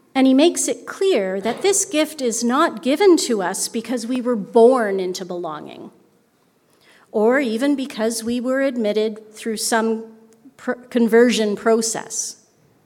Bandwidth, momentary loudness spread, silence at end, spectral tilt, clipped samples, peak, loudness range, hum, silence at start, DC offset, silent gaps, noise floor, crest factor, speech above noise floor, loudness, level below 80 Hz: 18 kHz; 13 LU; 0.5 s; -3 dB/octave; under 0.1%; -2 dBFS; 5 LU; none; 0.15 s; under 0.1%; none; -60 dBFS; 16 dB; 42 dB; -19 LUFS; -70 dBFS